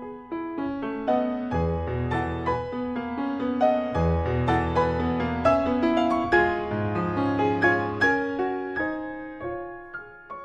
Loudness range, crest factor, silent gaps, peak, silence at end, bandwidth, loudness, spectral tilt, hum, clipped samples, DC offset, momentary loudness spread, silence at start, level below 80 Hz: 4 LU; 18 dB; none; -6 dBFS; 0 s; 9 kHz; -25 LUFS; -8 dB/octave; none; under 0.1%; under 0.1%; 12 LU; 0 s; -42 dBFS